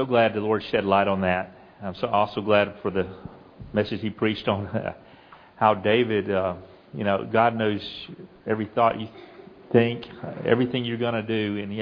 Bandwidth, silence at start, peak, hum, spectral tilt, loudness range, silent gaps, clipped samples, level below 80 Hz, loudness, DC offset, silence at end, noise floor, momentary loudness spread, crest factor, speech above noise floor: 5.4 kHz; 0 s; -4 dBFS; none; -8.5 dB/octave; 2 LU; none; under 0.1%; -58 dBFS; -24 LUFS; under 0.1%; 0 s; -50 dBFS; 16 LU; 20 dB; 26 dB